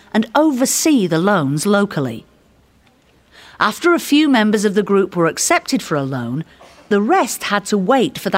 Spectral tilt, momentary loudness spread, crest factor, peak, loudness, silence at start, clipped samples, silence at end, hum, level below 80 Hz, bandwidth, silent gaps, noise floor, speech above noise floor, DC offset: -4.5 dB/octave; 9 LU; 16 dB; 0 dBFS; -16 LUFS; 0.15 s; under 0.1%; 0 s; none; -58 dBFS; 16 kHz; none; -53 dBFS; 38 dB; under 0.1%